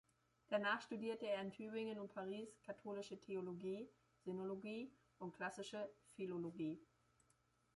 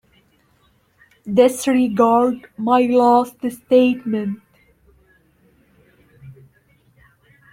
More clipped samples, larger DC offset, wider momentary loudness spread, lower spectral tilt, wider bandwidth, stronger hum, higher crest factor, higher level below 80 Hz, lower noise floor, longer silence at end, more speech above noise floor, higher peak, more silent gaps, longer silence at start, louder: neither; neither; about the same, 11 LU vs 13 LU; about the same, -5.5 dB/octave vs -5.5 dB/octave; second, 11.5 kHz vs 16 kHz; neither; about the same, 20 dB vs 18 dB; second, -86 dBFS vs -60 dBFS; first, -80 dBFS vs -59 dBFS; second, 0.9 s vs 1.2 s; second, 33 dB vs 43 dB; second, -30 dBFS vs -2 dBFS; neither; second, 0.5 s vs 1.25 s; second, -48 LUFS vs -17 LUFS